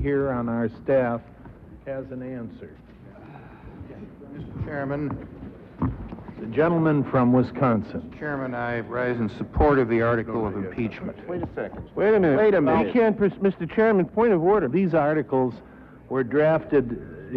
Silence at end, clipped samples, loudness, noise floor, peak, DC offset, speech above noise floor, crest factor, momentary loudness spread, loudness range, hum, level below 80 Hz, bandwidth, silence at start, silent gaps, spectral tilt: 0 s; under 0.1%; -23 LUFS; -44 dBFS; -8 dBFS; under 0.1%; 21 dB; 16 dB; 21 LU; 14 LU; none; -44 dBFS; 5.4 kHz; 0 s; none; -10.5 dB/octave